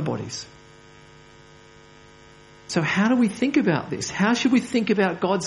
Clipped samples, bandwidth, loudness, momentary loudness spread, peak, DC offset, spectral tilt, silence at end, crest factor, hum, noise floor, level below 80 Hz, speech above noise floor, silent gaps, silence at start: under 0.1%; 11.5 kHz; -22 LUFS; 10 LU; -6 dBFS; under 0.1%; -5 dB/octave; 0 s; 18 dB; none; -49 dBFS; -60 dBFS; 27 dB; none; 0 s